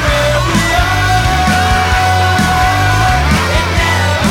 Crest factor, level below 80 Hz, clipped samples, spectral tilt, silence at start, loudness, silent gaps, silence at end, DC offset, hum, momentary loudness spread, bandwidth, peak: 10 dB; -20 dBFS; under 0.1%; -4.5 dB/octave; 0 s; -11 LUFS; none; 0 s; under 0.1%; none; 1 LU; 17.5 kHz; 0 dBFS